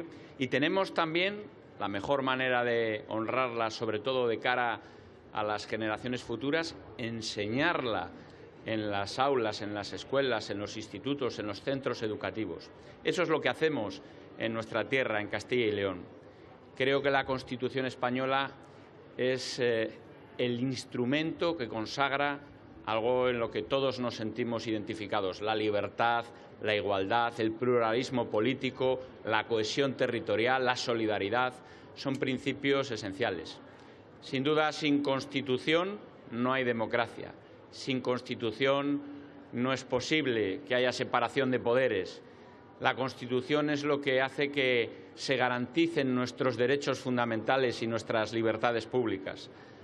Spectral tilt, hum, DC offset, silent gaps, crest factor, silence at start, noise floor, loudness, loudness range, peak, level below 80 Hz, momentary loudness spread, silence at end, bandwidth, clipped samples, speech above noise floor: -5 dB/octave; none; under 0.1%; none; 24 dB; 0 s; -53 dBFS; -31 LUFS; 3 LU; -8 dBFS; -70 dBFS; 11 LU; 0 s; 11.5 kHz; under 0.1%; 22 dB